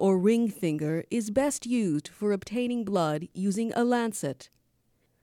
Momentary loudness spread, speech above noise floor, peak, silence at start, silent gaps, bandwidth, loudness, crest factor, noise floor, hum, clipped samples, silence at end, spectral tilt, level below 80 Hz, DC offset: 6 LU; 43 dB; -12 dBFS; 0 s; none; 16 kHz; -28 LUFS; 16 dB; -70 dBFS; none; under 0.1%; 0.75 s; -6 dB/octave; -66 dBFS; under 0.1%